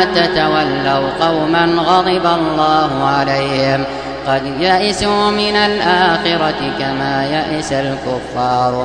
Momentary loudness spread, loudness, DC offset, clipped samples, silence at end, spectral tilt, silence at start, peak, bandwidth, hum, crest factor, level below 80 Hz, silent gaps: 6 LU; -14 LUFS; 0.3%; under 0.1%; 0 s; -5 dB/octave; 0 s; 0 dBFS; 10.5 kHz; none; 14 dB; -40 dBFS; none